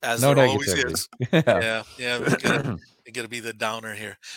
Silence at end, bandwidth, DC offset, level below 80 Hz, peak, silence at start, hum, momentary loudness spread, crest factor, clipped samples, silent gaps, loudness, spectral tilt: 0 s; 17 kHz; under 0.1%; -58 dBFS; -2 dBFS; 0 s; none; 15 LU; 20 dB; under 0.1%; none; -23 LUFS; -4.5 dB/octave